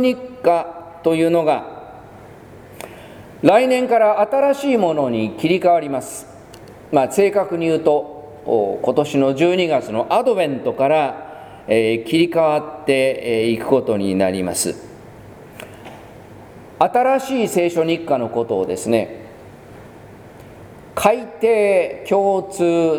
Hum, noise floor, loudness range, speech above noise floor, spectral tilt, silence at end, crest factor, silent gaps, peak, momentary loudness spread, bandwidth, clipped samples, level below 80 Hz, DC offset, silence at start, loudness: none; -40 dBFS; 5 LU; 23 dB; -5 dB/octave; 0 s; 18 dB; none; 0 dBFS; 19 LU; 20 kHz; under 0.1%; -56 dBFS; under 0.1%; 0 s; -18 LUFS